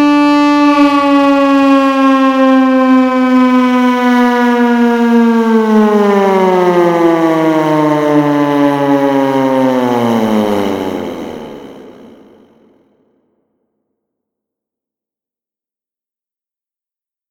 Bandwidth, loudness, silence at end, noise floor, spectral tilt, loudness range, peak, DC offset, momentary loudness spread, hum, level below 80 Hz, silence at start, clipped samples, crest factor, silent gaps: 16.5 kHz; -10 LUFS; 5.4 s; -90 dBFS; -6.5 dB/octave; 9 LU; 0 dBFS; under 0.1%; 5 LU; none; -52 dBFS; 0 s; under 0.1%; 12 dB; none